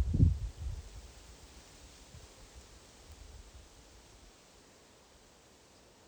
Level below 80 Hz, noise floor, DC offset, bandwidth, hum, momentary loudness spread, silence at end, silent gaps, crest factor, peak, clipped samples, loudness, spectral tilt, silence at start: -44 dBFS; -61 dBFS; under 0.1%; 20 kHz; none; 21 LU; 2.5 s; none; 24 dB; -14 dBFS; under 0.1%; -34 LUFS; -7 dB/octave; 0 s